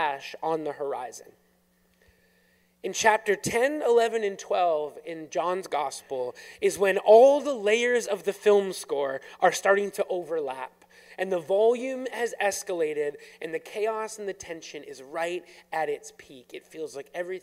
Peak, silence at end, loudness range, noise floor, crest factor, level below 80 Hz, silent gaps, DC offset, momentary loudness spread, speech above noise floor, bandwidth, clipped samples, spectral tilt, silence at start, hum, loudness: -6 dBFS; 0.05 s; 10 LU; -66 dBFS; 20 dB; -70 dBFS; none; under 0.1%; 16 LU; 40 dB; 16 kHz; under 0.1%; -3 dB/octave; 0 s; none; -26 LUFS